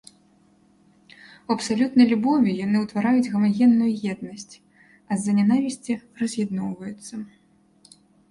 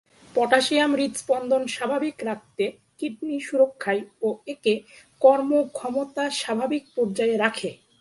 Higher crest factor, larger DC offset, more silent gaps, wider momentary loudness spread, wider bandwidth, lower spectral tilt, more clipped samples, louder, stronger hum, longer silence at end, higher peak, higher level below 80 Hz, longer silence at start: about the same, 18 dB vs 22 dB; neither; neither; first, 19 LU vs 11 LU; about the same, 11.5 kHz vs 11.5 kHz; first, -6 dB/octave vs -3.5 dB/octave; neither; about the same, -22 LUFS vs -24 LUFS; neither; first, 1.05 s vs 0.25 s; second, -6 dBFS vs -2 dBFS; about the same, -66 dBFS vs -70 dBFS; first, 1.5 s vs 0.35 s